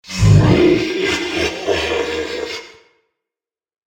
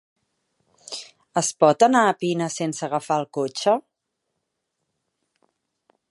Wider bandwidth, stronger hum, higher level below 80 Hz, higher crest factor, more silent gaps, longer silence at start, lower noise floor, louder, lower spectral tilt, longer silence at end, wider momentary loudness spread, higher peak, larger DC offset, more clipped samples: first, 15.5 kHz vs 11.5 kHz; neither; first, -32 dBFS vs -78 dBFS; second, 16 dB vs 22 dB; neither; second, 0.05 s vs 0.9 s; first, under -90 dBFS vs -79 dBFS; first, -16 LUFS vs -21 LUFS; first, -6 dB/octave vs -4 dB/octave; second, 1.2 s vs 2.3 s; second, 13 LU vs 18 LU; about the same, 0 dBFS vs -2 dBFS; neither; neither